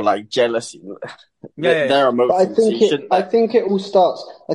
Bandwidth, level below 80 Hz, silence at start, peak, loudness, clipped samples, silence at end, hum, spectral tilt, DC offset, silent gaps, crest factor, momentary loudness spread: 11.5 kHz; -66 dBFS; 0 s; -2 dBFS; -17 LUFS; under 0.1%; 0 s; none; -5 dB/octave; under 0.1%; none; 16 dB; 17 LU